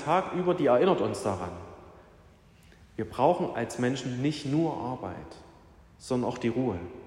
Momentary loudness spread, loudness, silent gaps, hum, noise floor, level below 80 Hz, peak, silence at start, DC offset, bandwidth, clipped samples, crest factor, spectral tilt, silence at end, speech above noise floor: 19 LU; -29 LUFS; none; none; -56 dBFS; -60 dBFS; -10 dBFS; 0 s; under 0.1%; 12.5 kHz; under 0.1%; 20 dB; -6.5 dB/octave; 0 s; 28 dB